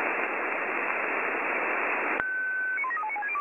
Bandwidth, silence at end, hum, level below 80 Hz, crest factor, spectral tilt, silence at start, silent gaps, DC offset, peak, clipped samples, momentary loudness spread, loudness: 15.5 kHz; 0 s; none; -74 dBFS; 20 dB; -5 dB/octave; 0 s; none; under 0.1%; -8 dBFS; under 0.1%; 2 LU; -28 LUFS